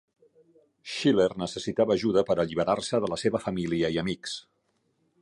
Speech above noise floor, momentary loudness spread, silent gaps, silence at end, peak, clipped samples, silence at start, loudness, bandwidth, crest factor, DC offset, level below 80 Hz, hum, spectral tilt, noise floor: 46 dB; 11 LU; none; 0.8 s; -10 dBFS; under 0.1%; 0.85 s; -27 LUFS; 11.5 kHz; 18 dB; under 0.1%; -58 dBFS; none; -5.5 dB/octave; -72 dBFS